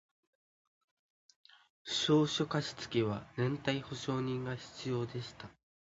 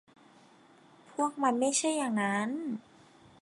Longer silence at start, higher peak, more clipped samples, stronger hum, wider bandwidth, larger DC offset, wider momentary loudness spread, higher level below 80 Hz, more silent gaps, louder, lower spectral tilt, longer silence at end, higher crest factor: first, 1.85 s vs 1.1 s; about the same, -16 dBFS vs -14 dBFS; neither; neither; second, 7.6 kHz vs 11.5 kHz; neither; first, 15 LU vs 12 LU; first, -68 dBFS vs -82 dBFS; neither; second, -35 LUFS vs -31 LUFS; about the same, -4.5 dB/octave vs -3.5 dB/octave; second, 0.45 s vs 0.6 s; about the same, 20 dB vs 20 dB